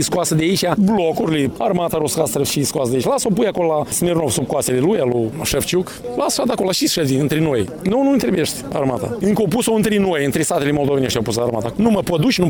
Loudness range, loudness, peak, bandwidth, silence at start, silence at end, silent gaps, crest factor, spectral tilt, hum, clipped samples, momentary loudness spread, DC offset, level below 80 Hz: 1 LU; -18 LUFS; 0 dBFS; 19.5 kHz; 0 s; 0 s; none; 16 dB; -5 dB/octave; none; under 0.1%; 4 LU; under 0.1%; -44 dBFS